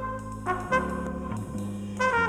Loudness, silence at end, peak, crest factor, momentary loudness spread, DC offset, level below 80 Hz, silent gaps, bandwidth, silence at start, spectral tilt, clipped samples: -30 LUFS; 0 s; -10 dBFS; 18 dB; 8 LU; under 0.1%; -46 dBFS; none; 14.5 kHz; 0 s; -6 dB/octave; under 0.1%